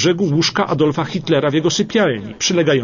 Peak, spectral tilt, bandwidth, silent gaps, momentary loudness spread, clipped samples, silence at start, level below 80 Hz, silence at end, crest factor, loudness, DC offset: -2 dBFS; -4.5 dB/octave; 7.4 kHz; none; 3 LU; under 0.1%; 0 s; -52 dBFS; 0 s; 14 dB; -17 LUFS; under 0.1%